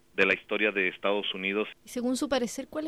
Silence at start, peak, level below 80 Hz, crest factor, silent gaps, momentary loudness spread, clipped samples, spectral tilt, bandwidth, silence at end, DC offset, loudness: 0.15 s; -8 dBFS; -62 dBFS; 20 dB; none; 8 LU; under 0.1%; -3.5 dB/octave; 15 kHz; 0 s; under 0.1%; -28 LUFS